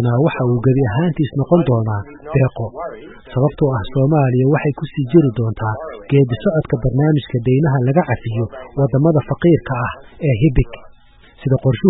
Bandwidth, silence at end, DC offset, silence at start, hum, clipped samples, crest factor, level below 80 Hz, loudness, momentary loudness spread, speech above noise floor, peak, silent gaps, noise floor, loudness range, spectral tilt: 4 kHz; 0 s; under 0.1%; 0 s; none; under 0.1%; 16 dB; -34 dBFS; -17 LUFS; 10 LU; 30 dB; 0 dBFS; none; -45 dBFS; 2 LU; -13.5 dB/octave